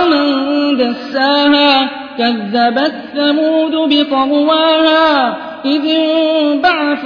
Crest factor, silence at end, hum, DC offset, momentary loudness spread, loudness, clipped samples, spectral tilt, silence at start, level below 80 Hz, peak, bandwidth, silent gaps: 12 dB; 0 s; none; under 0.1%; 7 LU; -12 LUFS; under 0.1%; -5.5 dB/octave; 0 s; -56 dBFS; 0 dBFS; 5.4 kHz; none